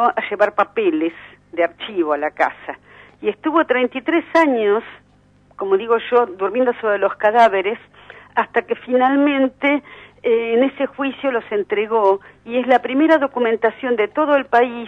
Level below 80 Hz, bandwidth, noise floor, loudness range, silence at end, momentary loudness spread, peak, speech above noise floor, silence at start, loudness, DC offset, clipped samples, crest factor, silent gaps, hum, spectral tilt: -62 dBFS; 8.2 kHz; -53 dBFS; 3 LU; 0 s; 8 LU; -2 dBFS; 35 dB; 0 s; -18 LUFS; under 0.1%; under 0.1%; 16 dB; none; 50 Hz at -55 dBFS; -5.5 dB/octave